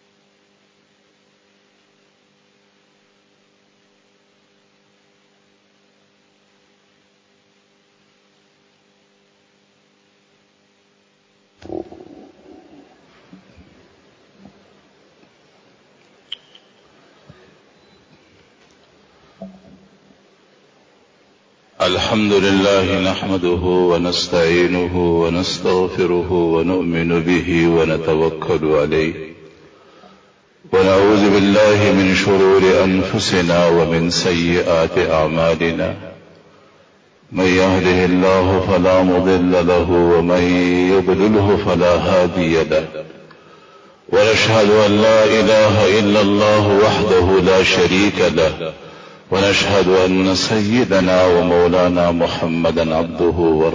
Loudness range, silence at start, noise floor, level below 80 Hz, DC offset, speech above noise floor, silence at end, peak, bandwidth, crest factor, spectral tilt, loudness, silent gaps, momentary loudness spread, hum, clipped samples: 5 LU; 11.65 s; -58 dBFS; -38 dBFS; under 0.1%; 44 dB; 0 s; -2 dBFS; 8 kHz; 14 dB; -5.5 dB/octave; -14 LUFS; none; 7 LU; none; under 0.1%